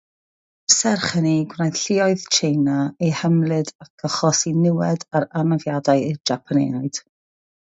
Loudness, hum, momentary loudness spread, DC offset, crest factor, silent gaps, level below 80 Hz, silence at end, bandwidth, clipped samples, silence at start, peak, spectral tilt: -20 LUFS; none; 8 LU; under 0.1%; 20 dB; 3.75-3.79 s, 3.90-3.98 s; -62 dBFS; 0.75 s; 8 kHz; under 0.1%; 0.7 s; 0 dBFS; -4.5 dB/octave